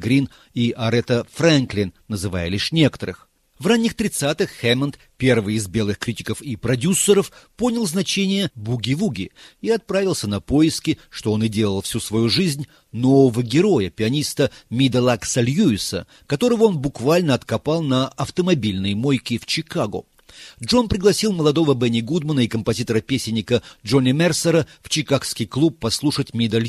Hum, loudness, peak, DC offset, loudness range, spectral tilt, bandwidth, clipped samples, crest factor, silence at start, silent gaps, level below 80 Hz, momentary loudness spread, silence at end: none; -20 LUFS; -2 dBFS; under 0.1%; 3 LU; -5 dB/octave; 14.5 kHz; under 0.1%; 18 dB; 0 s; none; -48 dBFS; 8 LU; 0 s